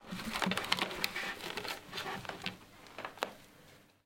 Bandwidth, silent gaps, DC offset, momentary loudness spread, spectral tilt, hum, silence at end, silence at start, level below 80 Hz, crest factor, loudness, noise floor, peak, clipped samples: 17 kHz; none; under 0.1%; 17 LU; -3 dB/octave; none; 0.2 s; 0 s; -64 dBFS; 32 dB; -38 LUFS; -61 dBFS; -10 dBFS; under 0.1%